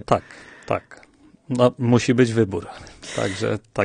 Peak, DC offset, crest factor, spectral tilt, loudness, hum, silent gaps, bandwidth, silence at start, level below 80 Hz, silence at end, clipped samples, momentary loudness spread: -2 dBFS; under 0.1%; 20 dB; -6 dB/octave; -22 LUFS; none; none; 10 kHz; 0.1 s; -52 dBFS; 0 s; under 0.1%; 20 LU